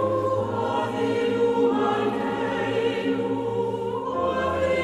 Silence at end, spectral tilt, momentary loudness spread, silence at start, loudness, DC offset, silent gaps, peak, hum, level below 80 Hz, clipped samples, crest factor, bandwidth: 0 s; -6.5 dB/octave; 5 LU; 0 s; -24 LUFS; under 0.1%; none; -10 dBFS; none; -54 dBFS; under 0.1%; 12 dB; 12 kHz